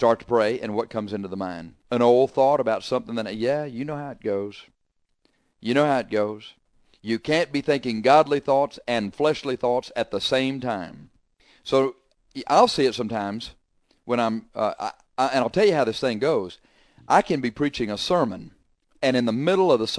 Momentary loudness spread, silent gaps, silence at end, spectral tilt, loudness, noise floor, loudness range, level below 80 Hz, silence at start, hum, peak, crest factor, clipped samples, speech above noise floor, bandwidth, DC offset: 13 LU; none; 0 s; -5.5 dB/octave; -23 LUFS; -71 dBFS; 4 LU; -58 dBFS; 0 s; none; -4 dBFS; 20 dB; under 0.1%; 49 dB; 11 kHz; under 0.1%